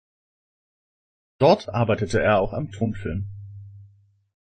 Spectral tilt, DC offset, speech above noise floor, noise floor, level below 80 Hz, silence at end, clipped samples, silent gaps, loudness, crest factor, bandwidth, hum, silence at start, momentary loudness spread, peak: -7 dB/octave; under 0.1%; 34 dB; -55 dBFS; -46 dBFS; 0.6 s; under 0.1%; none; -22 LUFS; 22 dB; 9.4 kHz; none; 1.4 s; 20 LU; -4 dBFS